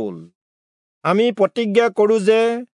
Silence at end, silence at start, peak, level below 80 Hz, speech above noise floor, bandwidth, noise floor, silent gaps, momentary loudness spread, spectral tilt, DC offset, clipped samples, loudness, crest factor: 0.1 s; 0 s; -2 dBFS; -76 dBFS; over 73 dB; 11 kHz; under -90 dBFS; 0.35-1.01 s; 7 LU; -6 dB/octave; under 0.1%; under 0.1%; -17 LUFS; 16 dB